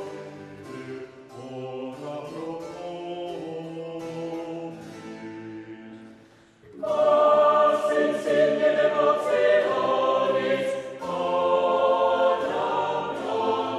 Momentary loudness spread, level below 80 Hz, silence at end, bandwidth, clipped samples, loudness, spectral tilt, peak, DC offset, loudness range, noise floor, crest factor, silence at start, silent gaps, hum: 19 LU; -70 dBFS; 0 s; 11.5 kHz; under 0.1%; -24 LUFS; -5 dB/octave; -8 dBFS; under 0.1%; 15 LU; -53 dBFS; 16 dB; 0 s; none; none